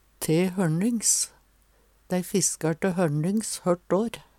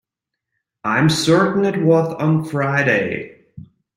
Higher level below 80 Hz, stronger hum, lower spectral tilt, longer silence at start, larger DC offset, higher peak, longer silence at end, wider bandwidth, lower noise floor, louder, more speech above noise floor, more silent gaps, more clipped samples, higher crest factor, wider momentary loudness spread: second, -60 dBFS vs -54 dBFS; neither; second, -4.5 dB/octave vs -6 dB/octave; second, 0.2 s vs 0.85 s; neither; second, -10 dBFS vs -2 dBFS; second, 0.15 s vs 0.35 s; about the same, 17 kHz vs 15.5 kHz; second, -62 dBFS vs -82 dBFS; second, -25 LUFS vs -17 LUFS; second, 36 dB vs 65 dB; neither; neither; about the same, 16 dB vs 16 dB; second, 5 LU vs 11 LU